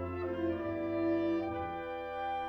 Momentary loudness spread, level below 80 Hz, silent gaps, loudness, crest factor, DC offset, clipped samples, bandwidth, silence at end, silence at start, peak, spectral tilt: 7 LU; -60 dBFS; none; -35 LUFS; 12 dB; under 0.1%; under 0.1%; 5.6 kHz; 0 s; 0 s; -24 dBFS; -8.5 dB/octave